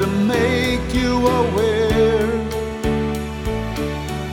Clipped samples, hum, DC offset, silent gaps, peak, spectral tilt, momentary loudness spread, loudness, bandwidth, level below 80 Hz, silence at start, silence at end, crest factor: under 0.1%; none; under 0.1%; none; -4 dBFS; -6 dB/octave; 8 LU; -19 LUFS; 18 kHz; -30 dBFS; 0 s; 0 s; 14 dB